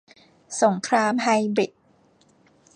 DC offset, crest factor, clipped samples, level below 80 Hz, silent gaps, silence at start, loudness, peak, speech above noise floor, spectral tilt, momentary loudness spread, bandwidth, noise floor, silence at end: under 0.1%; 20 dB; under 0.1%; -76 dBFS; none; 0.5 s; -22 LUFS; -6 dBFS; 38 dB; -4.5 dB/octave; 8 LU; 10.5 kHz; -59 dBFS; 1.1 s